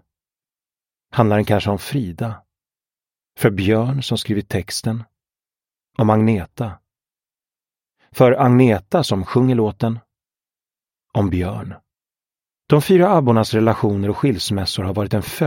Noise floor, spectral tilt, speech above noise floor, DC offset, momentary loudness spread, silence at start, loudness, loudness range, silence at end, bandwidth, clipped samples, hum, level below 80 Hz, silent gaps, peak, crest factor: under -90 dBFS; -6.5 dB/octave; over 73 dB; under 0.1%; 14 LU; 1.15 s; -18 LUFS; 5 LU; 0 s; 16.5 kHz; under 0.1%; none; -48 dBFS; none; 0 dBFS; 18 dB